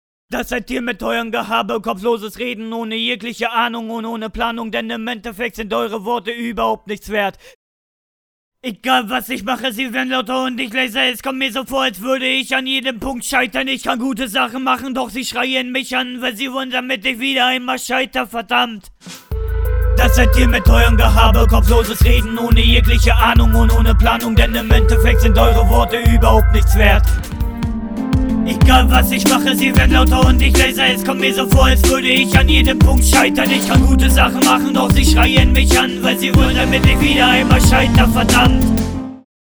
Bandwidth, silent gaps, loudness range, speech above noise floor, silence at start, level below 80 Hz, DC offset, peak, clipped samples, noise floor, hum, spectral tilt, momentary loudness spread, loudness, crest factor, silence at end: over 20 kHz; 7.55-8.52 s; 9 LU; over 77 dB; 0.3 s; -18 dBFS; under 0.1%; 0 dBFS; under 0.1%; under -90 dBFS; none; -5 dB/octave; 11 LU; -14 LUFS; 14 dB; 0.35 s